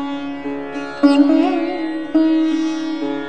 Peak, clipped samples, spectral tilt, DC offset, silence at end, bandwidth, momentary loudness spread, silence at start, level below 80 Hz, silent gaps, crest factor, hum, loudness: -2 dBFS; under 0.1%; -5 dB/octave; 1%; 0 s; 9 kHz; 13 LU; 0 s; -56 dBFS; none; 16 dB; none; -18 LUFS